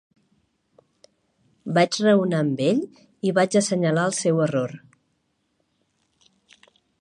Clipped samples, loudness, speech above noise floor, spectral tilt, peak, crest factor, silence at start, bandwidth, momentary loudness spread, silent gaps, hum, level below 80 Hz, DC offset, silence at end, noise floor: under 0.1%; -22 LUFS; 51 dB; -5.5 dB/octave; -4 dBFS; 20 dB; 1.65 s; 11.5 kHz; 12 LU; none; none; -72 dBFS; under 0.1%; 2.25 s; -71 dBFS